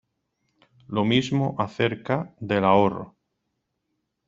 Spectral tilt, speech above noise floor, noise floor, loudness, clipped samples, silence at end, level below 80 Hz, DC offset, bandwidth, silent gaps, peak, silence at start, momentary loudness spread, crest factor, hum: -6.5 dB/octave; 55 dB; -78 dBFS; -24 LUFS; under 0.1%; 1.2 s; -62 dBFS; under 0.1%; 7.6 kHz; none; -4 dBFS; 0.9 s; 10 LU; 22 dB; none